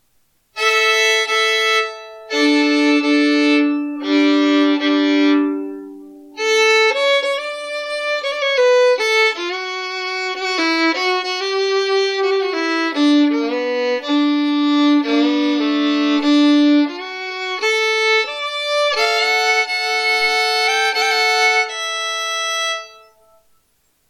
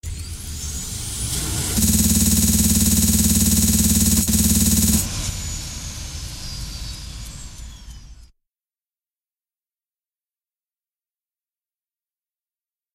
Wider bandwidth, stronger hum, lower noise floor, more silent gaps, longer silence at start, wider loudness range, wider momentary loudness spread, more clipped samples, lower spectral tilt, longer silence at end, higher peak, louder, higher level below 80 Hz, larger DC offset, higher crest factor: about the same, 15 kHz vs 16 kHz; neither; second, -62 dBFS vs under -90 dBFS; neither; first, 0.55 s vs 0.05 s; second, 3 LU vs 19 LU; second, 9 LU vs 17 LU; neither; second, -1 dB/octave vs -3.5 dB/octave; second, 1.2 s vs 4.7 s; about the same, -6 dBFS vs -4 dBFS; about the same, -16 LUFS vs -17 LUFS; second, -70 dBFS vs -30 dBFS; neither; second, 12 dB vs 18 dB